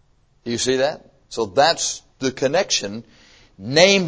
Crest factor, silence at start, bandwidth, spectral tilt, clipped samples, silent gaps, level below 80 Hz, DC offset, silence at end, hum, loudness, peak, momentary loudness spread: 20 dB; 0.45 s; 8 kHz; -3 dB/octave; under 0.1%; none; -56 dBFS; under 0.1%; 0 s; none; -20 LUFS; 0 dBFS; 19 LU